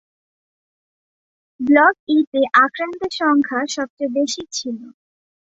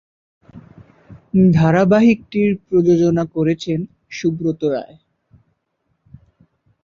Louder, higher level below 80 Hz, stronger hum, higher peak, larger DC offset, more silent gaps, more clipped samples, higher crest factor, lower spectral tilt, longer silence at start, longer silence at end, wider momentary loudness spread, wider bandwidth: about the same, -18 LUFS vs -16 LUFS; second, -64 dBFS vs -50 dBFS; neither; about the same, -2 dBFS vs -2 dBFS; neither; first, 1.99-2.07 s, 2.27-2.32 s, 3.90-3.97 s vs none; neither; about the same, 18 dB vs 16 dB; second, -2.5 dB/octave vs -8 dB/octave; first, 1.6 s vs 0.55 s; second, 0.7 s vs 2 s; about the same, 13 LU vs 11 LU; about the same, 8 kHz vs 7.4 kHz